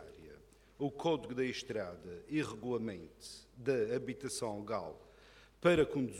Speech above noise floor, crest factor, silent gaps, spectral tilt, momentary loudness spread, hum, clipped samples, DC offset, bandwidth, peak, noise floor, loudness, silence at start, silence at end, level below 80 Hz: 25 dB; 20 dB; none; -5.5 dB/octave; 19 LU; none; under 0.1%; under 0.1%; 16 kHz; -18 dBFS; -61 dBFS; -37 LUFS; 0 s; 0 s; -64 dBFS